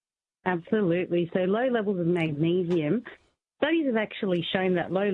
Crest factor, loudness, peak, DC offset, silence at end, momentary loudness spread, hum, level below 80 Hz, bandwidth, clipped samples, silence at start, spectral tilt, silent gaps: 18 dB; -27 LUFS; -8 dBFS; under 0.1%; 0 s; 5 LU; none; -68 dBFS; 4.8 kHz; under 0.1%; 0.45 s; -8.5 dB/octave; none